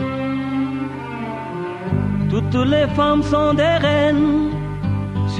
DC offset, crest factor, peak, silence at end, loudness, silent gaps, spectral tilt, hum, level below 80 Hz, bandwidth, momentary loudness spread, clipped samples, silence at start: under 0.1%; 14 dB; -4 dBFS; 0 s; -19 LUFS; none; -7.5 dB/octave; none; -38 dBFS; 9.6 kHz; 11 LU; under 0.1%; 0 s